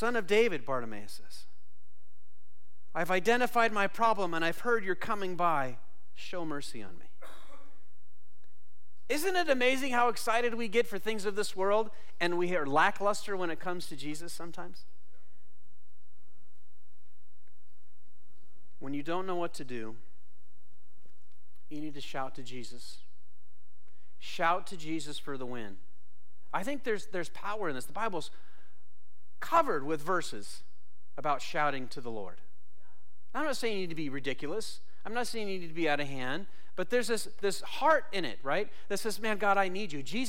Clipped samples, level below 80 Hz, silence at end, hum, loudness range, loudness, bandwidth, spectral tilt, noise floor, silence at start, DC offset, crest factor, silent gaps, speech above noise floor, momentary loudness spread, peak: under 0.1%; -68 dBFS; 0 s; none; 14 LU; -32 LUFS; 16.5 kHz; -4 dB/octave; -72 dBFS; 0 s; 3%; 18 dB; none; 40 dB; 18 LU; -14 dBFS